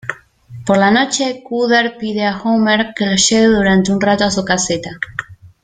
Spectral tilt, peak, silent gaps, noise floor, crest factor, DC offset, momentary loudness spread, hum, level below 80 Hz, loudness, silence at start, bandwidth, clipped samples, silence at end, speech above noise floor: -3.5 dB/octave; 0 dBFS; none; -36 dBFS; 14 dB; under 0.1%; 12 LU; none; -44 dBFS; -14 LUFS; 0.05 s; 9.6 kHz; under 0.1%; 0.15 s; 21 dB